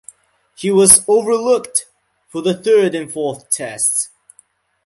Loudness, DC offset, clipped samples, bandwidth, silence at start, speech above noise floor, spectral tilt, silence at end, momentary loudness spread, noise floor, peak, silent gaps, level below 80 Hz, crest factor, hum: -14 LUFS; under 0.1%; 0.1%; 16 kHz; 0.6 s; 39 dB; -3 dB/octave; 0.8 s; 15 LU; -54 dBFS; 0 dBFS; none; -56 dBFS; 16 dB; none